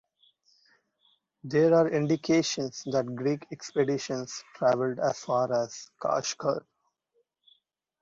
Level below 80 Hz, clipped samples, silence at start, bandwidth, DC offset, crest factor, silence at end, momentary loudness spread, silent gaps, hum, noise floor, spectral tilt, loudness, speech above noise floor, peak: -70 dBFS; under 0.1%; 1.45 s; 7.8 kHz; under 0.1%; 18 dB; 1.45 s; 11 LU; none; none; -75 dBFS; -5 dB/octave; -28 LUFS; 47 dB; -12 dBFS